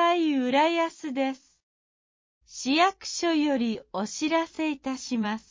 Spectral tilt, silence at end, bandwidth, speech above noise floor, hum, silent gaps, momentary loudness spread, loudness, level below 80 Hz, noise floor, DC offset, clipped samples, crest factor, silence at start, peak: -3.5 dB/octave; 0.1 s; 7.6 kHz; over 63 dB; none; 1.63-2.41 s; 10 LU; -26 LUFS; -68 dBFS; under -90 dBFS; under 0.1%; under 0.1%; 16 dB; 0 s; -12 dBFS